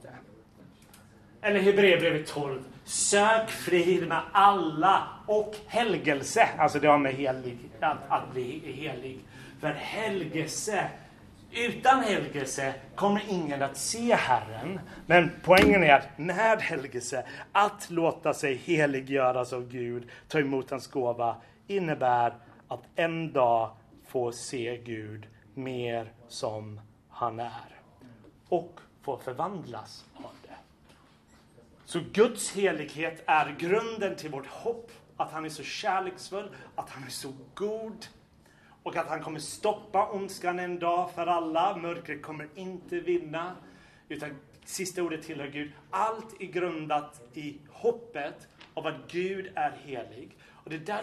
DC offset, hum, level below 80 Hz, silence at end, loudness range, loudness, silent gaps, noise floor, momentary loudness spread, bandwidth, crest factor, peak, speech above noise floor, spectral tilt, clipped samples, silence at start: under 0.1%; none; -60 dBFS; 0 s; 12 LU; -28 LUFS; none; -59 dBFS; 18 LU; 13.5 kHz; 24 dB; -6 dBFS; 31 dB; -4 dB/octave; under 0.1%; 0.05 s